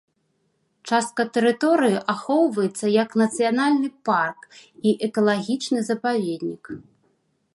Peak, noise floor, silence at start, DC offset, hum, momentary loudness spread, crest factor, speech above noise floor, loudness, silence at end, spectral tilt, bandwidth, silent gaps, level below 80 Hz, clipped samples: -6 dBFS; -70 dBFS; 0.85 s; under 0.1%; none; 8 LU; 16 dB; 48 dB; -22 LUFS; 0.75 s; -5 dB/octave; 11.5 kHz; none; -72 dBFS; under 0.1%